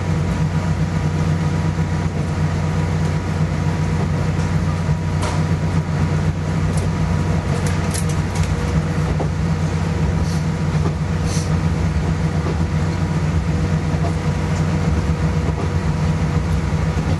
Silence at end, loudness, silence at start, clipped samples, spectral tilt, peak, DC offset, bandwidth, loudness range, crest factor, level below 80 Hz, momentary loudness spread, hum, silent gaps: 0 s; -20 LUFS; 0 s; under 0.1%; -7 dB/octave; -6 dBFS; under 0.1%; 12 kHz; 0 LU; 14 dB; -28 dBFS; 1 LU; none; none